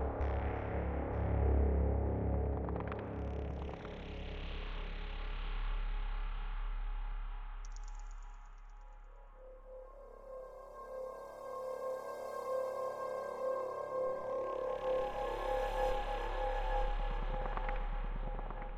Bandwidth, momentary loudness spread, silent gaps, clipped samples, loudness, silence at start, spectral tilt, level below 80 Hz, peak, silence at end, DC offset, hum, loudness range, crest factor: 8.8 kHz; 17 LU; none; under 0.1%; -40 LUFS; 0 s; -7.5 dB/octave; -40 dBFS; -22 dBFS; 0 s; under 0.1%; none; 14 LU; 16 dB